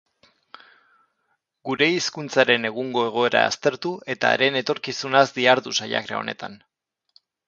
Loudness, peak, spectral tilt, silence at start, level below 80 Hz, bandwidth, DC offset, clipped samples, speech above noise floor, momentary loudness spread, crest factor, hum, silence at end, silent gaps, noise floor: -21 LUFS; 0 dBFS; -3.5 dB/octave; 1.65 s; -70 dBFS; 7.8 kHz; under 0.1%; under 0.1%; 51 dB; 11 LU; 24 dB; none; 0.9 s; none; -73 dBFS